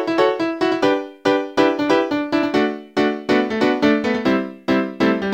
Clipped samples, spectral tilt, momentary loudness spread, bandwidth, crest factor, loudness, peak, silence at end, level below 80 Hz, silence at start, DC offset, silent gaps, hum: under 0.1%; -5.5 dB/octave; 3 LU; 16 kHz; 18 dB; -19 LUFS; -2 dBFS; 0 s; -54 dBFS; 0 s; under 0.1%; none; none